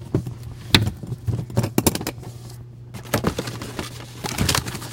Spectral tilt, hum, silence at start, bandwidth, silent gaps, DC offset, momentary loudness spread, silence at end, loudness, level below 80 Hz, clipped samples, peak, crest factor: -4 dB/octave; none; 0 s; 17 kHz; none; under 0.1%; 19 LU; 0 s; -24 LUFS; -40 dBFS; under 0.1%; 0 dBFS; 24 dB